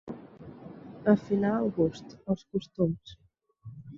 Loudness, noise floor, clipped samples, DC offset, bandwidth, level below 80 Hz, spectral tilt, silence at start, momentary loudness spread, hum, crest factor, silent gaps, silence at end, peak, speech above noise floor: -29 LUFS; -50 dBFS; under 0.1%; under 0.1%; 7.2 kHz; -60 dBFS; -8.5 dB/octave; 0.05 s; 22 LU; none; 22 dB; none; 0 s; -10 dBFS; 22 dB